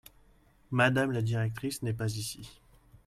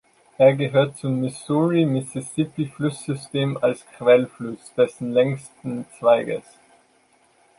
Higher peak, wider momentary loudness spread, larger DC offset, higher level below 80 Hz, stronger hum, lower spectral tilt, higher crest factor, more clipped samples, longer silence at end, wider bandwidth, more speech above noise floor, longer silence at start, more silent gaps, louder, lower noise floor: second, -12 dBFS vs -2 dBFS; about the same, 13 LU vs 13 LU; neither; about the same, -60 dBFS vs -64 dBFS; neither; about the same, -5.5 dB/octave vs -6.5 dB/octave; about the same, 22 dB vs 20 dB; neither; second, 0.55 s vs 1.2 s; first, 15.5 kHz vs 11.5 kHz; second, 32 dB vs 39 dB; first, 0.7 s vs 0.4 s; neither; second, -31 LUFS vs -22 LUFS; about the same, -62 dBFS vs -60 dBFS